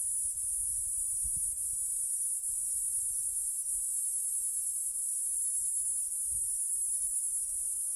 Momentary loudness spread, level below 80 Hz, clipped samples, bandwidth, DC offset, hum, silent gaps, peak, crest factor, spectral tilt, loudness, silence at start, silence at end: 2 LU; -60 dBFS; under 0.1%; over 20 kHz; under 0.1%; none; none; -20 dBFS; 14 dB; 1 dB/octave; -30 LUFS; 0 s; 0 s